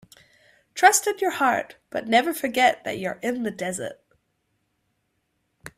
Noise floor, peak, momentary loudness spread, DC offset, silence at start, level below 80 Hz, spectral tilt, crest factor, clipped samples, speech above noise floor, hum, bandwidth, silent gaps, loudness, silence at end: -74 dBFS; -4 dBFS; 15 LU; under 0.1%; 0.75 s; -68 dBFS; -2 dB/octave; 22 dB; under 0.1%; 51 dB; none; 16 kHz; none; -23 LUFS; 0.1 s